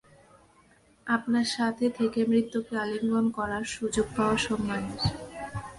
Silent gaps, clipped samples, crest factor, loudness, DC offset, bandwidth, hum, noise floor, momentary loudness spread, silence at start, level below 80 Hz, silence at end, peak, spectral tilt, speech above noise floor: none; under 0.1%; 16 dB; -28 LUFS; under 0.1%; 11.5 kHz; none; -60 dBFS; 6 LU; 1.05 s; -52 dBFS; 0 s; -12 dBFS; -5 dB/octave; 33 dB